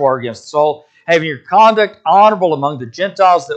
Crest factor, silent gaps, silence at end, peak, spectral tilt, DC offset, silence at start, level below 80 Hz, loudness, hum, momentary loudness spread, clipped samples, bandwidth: 12 dB; none; 0 s; 0 dBFS; -5 dB/octave; under 0.1%; 0 s; -64 dBFS; -13 LUFS; none; 11 LU; under 0.1%; 8.6 kHz